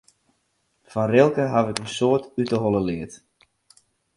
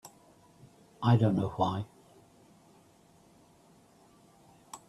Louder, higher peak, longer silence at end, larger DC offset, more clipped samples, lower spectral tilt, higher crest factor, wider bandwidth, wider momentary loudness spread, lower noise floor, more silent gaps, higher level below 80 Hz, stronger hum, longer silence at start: first, -22 LUFS vs -29 LUFS; first, -2 dBFS vs -12 dBFS; first, 1 s vs 0.1 s; neither; neither; second, -6 dB/octave vs -8 dB/octave; about the same, 22 dB vs 22 dB; about the same, 11.5 kHz vs 12.5 kHz; second, 13 LU vs 23 LU; first, -70 dBFS vs -62 dBFS; neither; first, -56 dBFS vs -66 dBFS; neither; first, 0.95 s vs 0.05 s